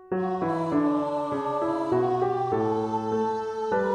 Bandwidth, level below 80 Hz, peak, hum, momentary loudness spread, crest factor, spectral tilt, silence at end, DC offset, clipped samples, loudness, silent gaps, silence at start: 9.8 kHz; -62 dBFS; -14 dBFS; none; 4 LU; 12 dB; -8 dB/octave; 0 s; under 0.1%; under 0.1%; -26 LUFS; none; 0 s